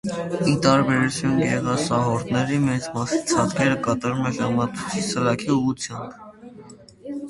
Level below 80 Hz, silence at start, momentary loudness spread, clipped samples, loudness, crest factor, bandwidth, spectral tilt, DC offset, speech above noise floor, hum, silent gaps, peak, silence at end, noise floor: -52 dBFS; 0.05 s; 12 LU; under 0.1%; -22 LUFS; 22 dB; 11.5 kHz; -5.5 dB/octave; under 0.1%; 23 dB; none; none; -2 dBFS; 0 s; -45 dBFS